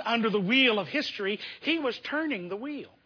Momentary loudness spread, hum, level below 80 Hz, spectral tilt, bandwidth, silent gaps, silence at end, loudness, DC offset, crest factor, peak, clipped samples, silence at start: 13 LU; none; -76 dBFS; -5.5 dB/octave; 5.4 kHz; none; 0.2 s; -27 LUFS; under 0.1%; 18 dB; -10 dBFS; under 0.1%; 0 s